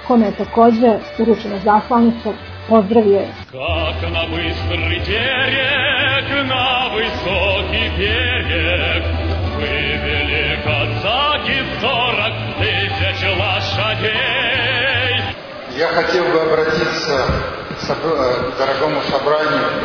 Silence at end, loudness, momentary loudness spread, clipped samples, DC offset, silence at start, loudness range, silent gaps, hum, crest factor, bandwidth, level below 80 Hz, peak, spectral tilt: 0 s; -16 LUFS; 6 LU; under 0.1%; under 0.1%; 0 s; 2 LU; none; none; 16 dB; 5.4 kHz; -32 dBFS; 0 dBFS; -6 dB/octave